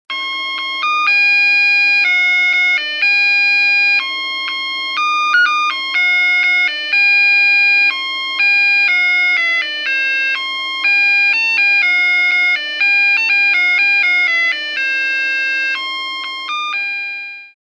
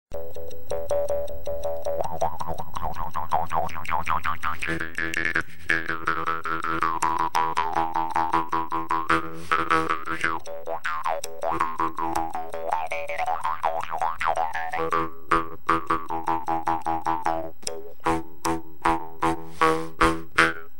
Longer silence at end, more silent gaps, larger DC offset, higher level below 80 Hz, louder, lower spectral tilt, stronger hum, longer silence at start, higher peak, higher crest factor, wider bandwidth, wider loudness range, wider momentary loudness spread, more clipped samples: first, 0.2 s vs 0 s; neither; second, under 0.1% vs 3%; second, under -90 dBFS vs -46 dBFS; first, -12 LUFS vs -26 LUFS; second, 3 dB/octave vs -4 dB/octave; neither; about the same, 0.1 s vs 0.05 s; about the same, -4 dBFS vs -2 dBFS; second, 10 dB vs 24 dB; second, 11 kHz vs 17 kHz; about the same, 3 LU vs 4 LU; about the same, 9 LU vs 9 LU; neither